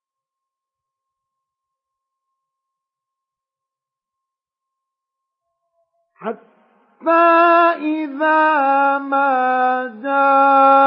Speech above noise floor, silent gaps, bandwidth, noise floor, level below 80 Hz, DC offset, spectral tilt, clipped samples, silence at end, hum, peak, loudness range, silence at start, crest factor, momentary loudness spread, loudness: 72 dB; none; 5.4 kHz; -86 dBFS; -90 dBFS; under 0.1%; -8 dB/octave; under 0.1%; 0 s; none; -2 dBFS; 5 LU; 6.2 s; 16 dB; 17 LU; -15 LUFS